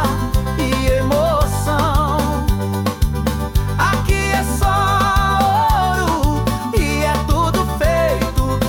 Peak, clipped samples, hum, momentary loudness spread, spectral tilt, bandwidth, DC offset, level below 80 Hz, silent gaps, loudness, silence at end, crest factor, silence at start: -6 dBFS; under 0.1%; none; 5 LU; -5.5 dB/octave; 18 kHz; under 0.1%; -22 dBFS; none; -17 LUFS; 0 s; 12 dB; 0 s